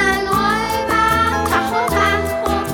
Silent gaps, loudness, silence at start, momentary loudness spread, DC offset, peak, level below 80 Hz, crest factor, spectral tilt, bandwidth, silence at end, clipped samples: none; -16 LUFS; 0 s; 4 LU; under 0.1%; -4 dBFS; -32 dBFS; 14 dB; -4.5 dB/octave; 20 kHz; 0 s; under 0.1%